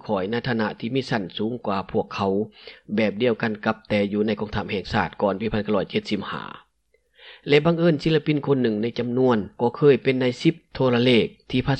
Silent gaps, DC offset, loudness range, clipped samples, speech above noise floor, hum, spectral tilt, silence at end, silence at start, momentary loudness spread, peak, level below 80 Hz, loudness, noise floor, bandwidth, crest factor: none; under 0.1%; 4 LU; under 0.1%; 45 dB; none; -7.5 dB/octave; 0 s; 0.05 s; 9 LU; -6 dBFS; -52 dBFS; -23 LUFS; -67 dBFS; 9 kHz; 18 dB